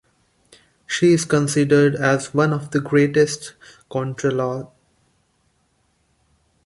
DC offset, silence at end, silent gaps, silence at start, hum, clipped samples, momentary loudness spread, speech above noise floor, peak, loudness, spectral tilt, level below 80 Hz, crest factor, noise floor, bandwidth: under 0.1%; 2 s; none; 0.9 s; none; under 0.1%; 11 LU; 46 dB; -2 dBFS; -19 LUFS; -5.5 dB/octave; -60 dBFS; 18 dB; -65 dBFS; 11.5 kHz